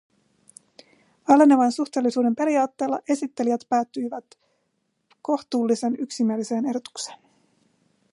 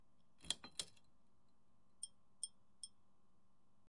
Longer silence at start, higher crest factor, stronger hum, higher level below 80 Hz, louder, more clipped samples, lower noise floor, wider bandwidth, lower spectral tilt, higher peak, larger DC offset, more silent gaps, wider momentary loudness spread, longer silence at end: first, 1.3 s vs 0.4 s; second, 22 dB vs 34 dB; neither; about the same, -78 dBFS vs -80 dBFS; first, -23 LUFS vs -50 LUFS; neither; second, -73 dBFS vs -80 dBFS; about the same, 11.5 kHz vs 12 kHz; first, -5 dB/octave vs 0.5 dB/octave; first, -2 dBFS vs -22 dBFS; neither; neither; first, 17 LU vs 12 LU; about the same, 0.95 s vs 1 s